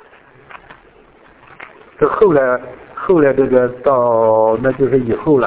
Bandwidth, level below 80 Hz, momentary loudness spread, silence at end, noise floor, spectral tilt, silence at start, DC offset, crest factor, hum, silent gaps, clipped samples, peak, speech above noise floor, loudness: 4 kHz; -46 dBFS; 6 LU; 0 s; -46 dBFS; -11.5 dB/octave; 1.6 s; under 0.1%; 14 dB; none; none; under 0.1%; 0 dBFS; 33 dB; -14 LUFS